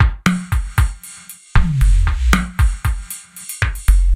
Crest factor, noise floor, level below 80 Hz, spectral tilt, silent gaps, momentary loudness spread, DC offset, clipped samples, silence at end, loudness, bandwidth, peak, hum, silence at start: 16 dB; -38 dBFS; -16 dBFS; -5 dB/octave; none; 14 LU; under 0.1%; under 0.1%; 0 s; -18 LUFS; 16 kHz; 0 dBFS; none; 0 s